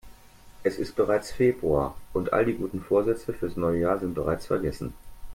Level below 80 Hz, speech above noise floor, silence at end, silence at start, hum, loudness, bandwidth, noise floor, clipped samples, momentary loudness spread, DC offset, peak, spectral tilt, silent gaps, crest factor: -46 dBFS; 23 dB; 0 s; 0.05 s; none; -27 LUFS; 16.5 kHz; -49 dBFS; under 0.1%; 7 LU; under 0.1%; -10 dBFS; -7 dB/octave; none; 18 dB